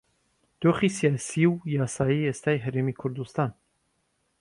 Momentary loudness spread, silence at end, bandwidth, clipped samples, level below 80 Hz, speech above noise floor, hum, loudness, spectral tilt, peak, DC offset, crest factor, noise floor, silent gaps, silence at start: 7 LU; 0.9 s; 11.5 kHz; under 0.1%; -60 dBFS; 48 dB; none; -26 LUFS; -6.5 dB/octave; -10 dBFS; under 0.1%; 18 dB; -73 dBFS; none; 0.6 s